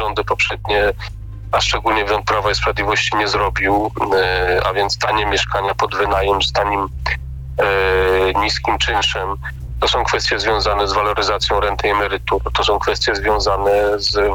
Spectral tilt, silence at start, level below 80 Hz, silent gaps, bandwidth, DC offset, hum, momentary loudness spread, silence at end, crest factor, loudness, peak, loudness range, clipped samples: -3.5 dB/octave; 0 s; -30 dBFS; none; 17.5 kHz; under 0.1%; none; 5 LU; 0 s; 10 dB; -17 LUFS; -6 dBFS; 1 LU; under 0.1%